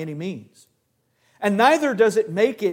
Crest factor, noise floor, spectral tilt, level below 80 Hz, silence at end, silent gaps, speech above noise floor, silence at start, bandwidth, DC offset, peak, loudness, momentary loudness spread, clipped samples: 18 dB; -69 dBFS; -5 dB/octave; -74 dBFS; 0 s; none; 49 dB; 0 s; 16.5 kHz; under 0.1%; -2 dBFS; -20 LUFS; 15 LU; under 0.1%